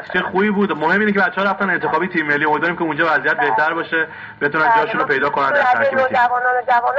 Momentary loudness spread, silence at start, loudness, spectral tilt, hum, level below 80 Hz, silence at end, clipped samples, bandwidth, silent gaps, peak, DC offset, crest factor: 5 LU; 0 s; -16 LUFS; -3 dB/octave; none; -58 dBFS; 0 s; under 0.1%; 7.6 kHz; none; -4 dBFS; under 0.1%; 14 dB